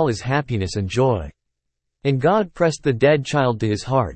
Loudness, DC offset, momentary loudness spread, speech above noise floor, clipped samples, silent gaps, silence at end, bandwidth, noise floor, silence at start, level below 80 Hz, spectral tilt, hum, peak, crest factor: -20 LUFS; under 0.1%; 7 LU; 59 dB; under 0.1%; none; 0 s; 8.8 kHz; -78 dBFS; 0 s; -46 dBFS; -6.5 dB/octave; none; -4 dBFS; 16 dB